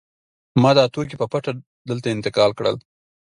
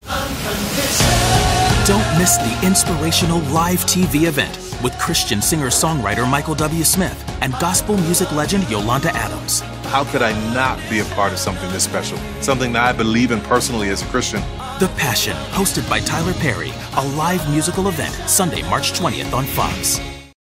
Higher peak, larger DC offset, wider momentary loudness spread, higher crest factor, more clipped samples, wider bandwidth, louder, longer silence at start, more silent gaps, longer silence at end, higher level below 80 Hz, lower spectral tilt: about the same, -2 dBFS vs -2 dBFS; neither; first, 14 LU vs 7 LU; about the same, 20 dB vs 16 dB; neither; second, 11 kHz vs 16 kHz; second, -20 LUFS vs -17 LUFS; first, 0.55 s vs 0.05 s; first, 1.66-1.85 s vs none; first, 0.55 s vs 0.15 s; second, -58 dBFS vs -32 dBFS; first, -6.5 dB/octave vs -3.5 dB/octave